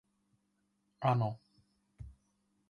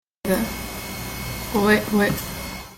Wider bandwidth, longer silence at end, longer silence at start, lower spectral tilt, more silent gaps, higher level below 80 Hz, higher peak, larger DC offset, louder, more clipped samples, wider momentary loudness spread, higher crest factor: second, 6.6 kHz vs 17 kHz; first, 0.6 s vs 0 s; first, 1 s vs 0.25 s; first, -9 dB/octave vs -4.5 dB/octave; neither; second, -64 dBFS vs -40 dBFS; second, -18 dBFS vs -4 dBFS; neither; second, -34 LUFS vs -23 LUFS; neither; first, 23 LU vs 12 LU; about the same, 20 dB vs 18 dB